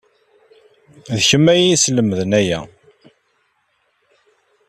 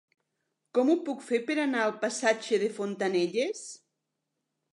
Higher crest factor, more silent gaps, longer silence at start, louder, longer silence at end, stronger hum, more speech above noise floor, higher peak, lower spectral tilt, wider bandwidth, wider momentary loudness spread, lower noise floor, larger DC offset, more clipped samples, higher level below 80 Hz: about the same, 18 dB vs 18 dB; neither; first, 1.1 s vs 0.75 s; first, -15 LUFS vs -29 LUFS; first, 2.05 s vs 1 s; neither; second, 50 dB vs 55 dB; first, -2 dBFS vs -12 dBFS; about the same, -4 dB/octave vs -4 dB/octave; first, 14 kHz vs 11.5 kHz; first, 11 LU vs 6 LU; second, -64 dBFS vs -83 dBFS; neither; neither; first, -54 dBFS vs -86 dBFS